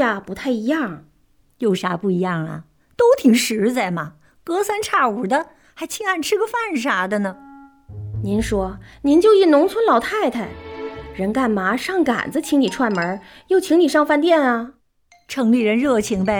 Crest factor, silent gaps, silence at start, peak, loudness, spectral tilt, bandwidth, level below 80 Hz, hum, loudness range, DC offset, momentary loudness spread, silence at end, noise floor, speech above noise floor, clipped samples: 16 dB; none; 0 s; -2 dBFS; -19 LUFS; -5 dB/octave; over 20 kHz; -46 dBFS; none; 4 LU; under 0.1%; 16 LU; 0 s; -58 dBFS; 40 dB; under 0.1%